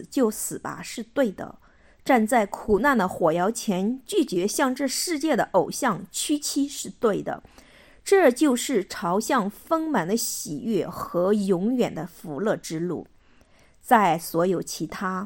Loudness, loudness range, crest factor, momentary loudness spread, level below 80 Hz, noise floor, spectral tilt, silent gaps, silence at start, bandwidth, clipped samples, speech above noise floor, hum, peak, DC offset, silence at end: -24 LUFS; 3 LU; 20 dB; 11 LU; -56 dBFS; -56 dBFS; -4.5 dB/octave; none; 0 s; 17 kHz; under 0.1%; 32 dB; none; -4 dBFS; under 0.1%; 0 s